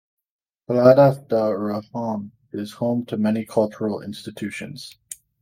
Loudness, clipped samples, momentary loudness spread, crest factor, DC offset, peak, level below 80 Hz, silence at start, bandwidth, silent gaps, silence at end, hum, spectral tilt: -21 LUFS; under 0.1%; 20 LU; 20 dB; under 0.1%; -2 dBFS; -66 dBFS; 0.7 s; 16.5 kHz; none; 0.25 s; none; -7 dB/octave